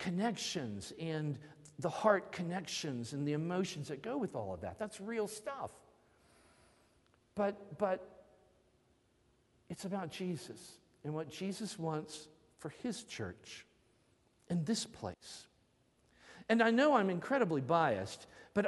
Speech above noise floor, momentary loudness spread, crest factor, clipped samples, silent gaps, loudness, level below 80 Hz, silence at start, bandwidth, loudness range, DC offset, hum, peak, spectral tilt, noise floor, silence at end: 36 dB; 19 LU; 24 dB; under 0.1%; none; -37 LUFS; -74 dBFS; 0 s; 11.5 kHz; 10 LU; under 0.1%; none; -14 dBFS; -5 dB/octave; -73 dBFS; 0 s